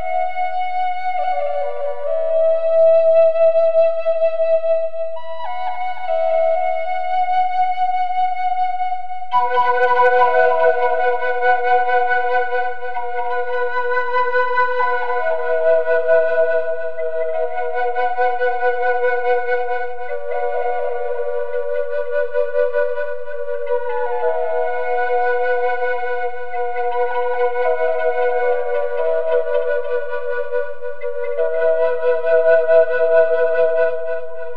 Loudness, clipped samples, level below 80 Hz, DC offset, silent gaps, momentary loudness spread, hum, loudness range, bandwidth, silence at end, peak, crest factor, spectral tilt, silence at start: -19 LUFS; under 0.1%; -74 dBFS; 8%; none; 10 LU; none; 5 LU; 5.4 kHz; 0 s; -2 dBFS; 16 dB; -4.5 dB/octave; 0 s